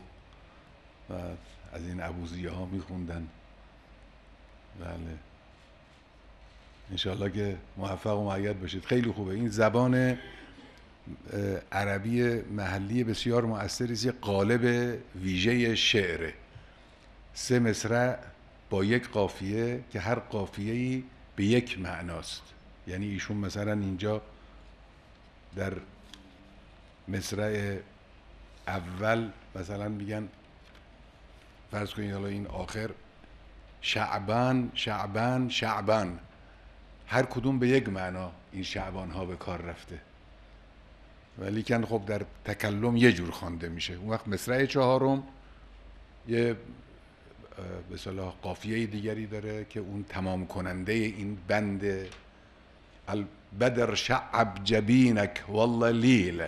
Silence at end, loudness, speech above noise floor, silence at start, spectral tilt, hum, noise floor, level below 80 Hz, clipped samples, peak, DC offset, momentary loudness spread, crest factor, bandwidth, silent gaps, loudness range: 0 s; -30 LUFS; 27 dB; 0 s; -5.5 dB/octave; none; -56 dBFS; -54 dBFS; under 0.1%; -8 dBFS; under 0.1%; 17 LU; 24 dB; 13.5 kHz; none; 11 LU